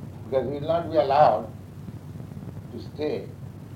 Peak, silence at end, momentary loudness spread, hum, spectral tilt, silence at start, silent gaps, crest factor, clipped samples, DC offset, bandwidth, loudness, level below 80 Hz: -6 dBFS; 0 s; 21 LU; none; -7.5 dB/octave; 0 s; none; 20 dB; under 0.1%; under 0.1%; 16 kHz; -24 LUFS; -54 dBFS